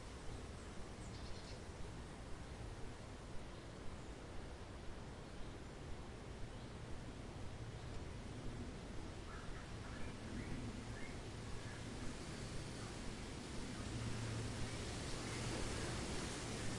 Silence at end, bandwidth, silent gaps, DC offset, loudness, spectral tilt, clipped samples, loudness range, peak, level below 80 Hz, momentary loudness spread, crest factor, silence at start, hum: 0 s; 11.5 kHz; none; under 0.1%; -49 LUFS; -4.5 dB/octave; under 0.1%; 7 LU; -32 dBFS; -54 dBFS; 8 LU; 16 dB; 0 s; none